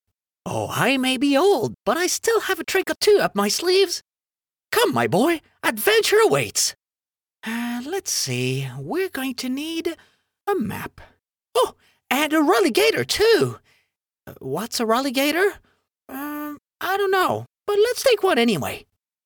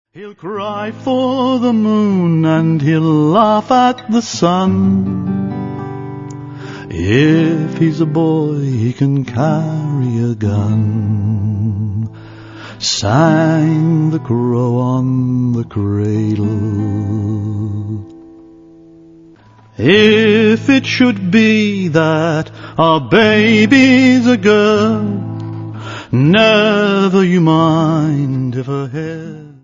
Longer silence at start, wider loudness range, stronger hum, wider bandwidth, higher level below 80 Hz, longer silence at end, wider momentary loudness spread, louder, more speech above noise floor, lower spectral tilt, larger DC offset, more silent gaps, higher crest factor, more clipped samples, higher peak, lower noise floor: first, 0.45 s vs 0.15 s; about the same, 6 LU vs 7 LU; neither; first, over 20 kHz vs 7.6 kHz; second, -58 dBFS vs -50 dBFS; first, 0.45 s vs 0.15 s; about the same, 13 LU vs 14 LU; second, -21 LUFS vs -13 LUFS; first, over 69 dB vs 31 dB; second, -3.5 dB/octave vs -6.5 dB/octave; neither; neither; first, 20 dB vs 14 dB; neither; about the same, -2 dBFS vs 0 dBFS; first, under -90 dBFS vs -43 dBFS